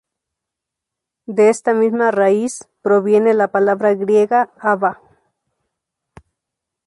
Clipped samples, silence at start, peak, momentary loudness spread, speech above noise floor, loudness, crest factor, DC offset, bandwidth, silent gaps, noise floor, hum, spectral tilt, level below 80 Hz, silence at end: under 0.1%; 1.3 s; -2 dBFS; 6 LU; 68 dB; -16 LUFS; 14 dB; under 0.1%; 11.5 kHz; none; -83 dBFS; none; -6 dB/octave; -64 dBFS; 1.95 s